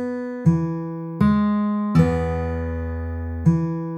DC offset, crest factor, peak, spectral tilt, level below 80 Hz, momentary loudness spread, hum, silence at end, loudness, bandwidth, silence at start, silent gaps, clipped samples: under 0.1%; 16 dB; -4 dBFS; -9.5 dB/octave; -36 dBFS; 10 LU; none; 0 s; -22 LUFS; 8.4 kHz; 0 s; none; under 0.1%